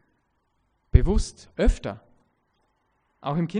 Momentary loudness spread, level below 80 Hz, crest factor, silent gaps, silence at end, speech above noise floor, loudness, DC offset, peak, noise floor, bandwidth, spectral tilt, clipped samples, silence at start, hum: 14 LU; -30 dBFS; 26 dB; none; 0 s; 47 dB; -26 LUFS; under 0.1%; 0 dBFS; -71 dBFS; 10 kHz; -7 dB/octave; under 0.1%; 0.95 s; none